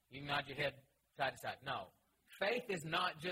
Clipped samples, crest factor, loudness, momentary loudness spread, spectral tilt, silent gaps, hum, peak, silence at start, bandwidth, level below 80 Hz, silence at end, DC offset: under 0.1%; 20 dB; -41 LUFS; 8 LU; -4 dB/octave; none; none; -22 dBFS; 0.1 s; 16 kHz; -74 dBFS; 0 s; under 0.1%